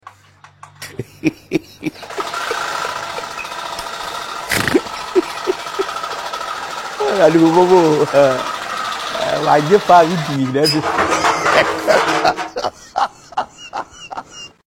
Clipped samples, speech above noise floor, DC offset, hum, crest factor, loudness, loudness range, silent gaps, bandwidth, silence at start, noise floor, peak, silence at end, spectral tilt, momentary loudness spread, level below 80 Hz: under 0.1%; 33 dB; under 0.1%; none; 18 dB; -17 LUFS; 9 LU; none; 16.5 kHz; 0.05 s; -46 dBFS; 0 dBFS; 0.2 s; -4.5 dB/octave; 16 LU; -50 dBFS